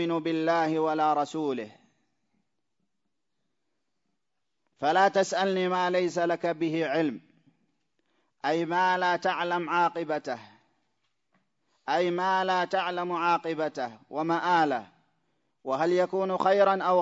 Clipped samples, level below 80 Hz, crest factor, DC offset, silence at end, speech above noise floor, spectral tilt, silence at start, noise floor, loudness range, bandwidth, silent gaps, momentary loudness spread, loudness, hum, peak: under 0.1%; -80 dBFS; 20 dB; under 0.1%; 0 s; 58 dB; -5 dB/octave; 0 s; -85 dBFS; 4 LU; 7.8 kHz; none; 10 LU; -27 LUFS; none; -10 dBFS